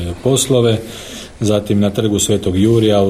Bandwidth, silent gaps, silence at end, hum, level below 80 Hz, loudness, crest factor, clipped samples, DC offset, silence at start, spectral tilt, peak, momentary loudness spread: 16 kHz; none; 0 s; none; -40 dBFS; -15 LUFS; 14 dB; under 0.1%; under 0.1%; 0 s; -5.5 dB/octave; -2 dBFS; 12 LU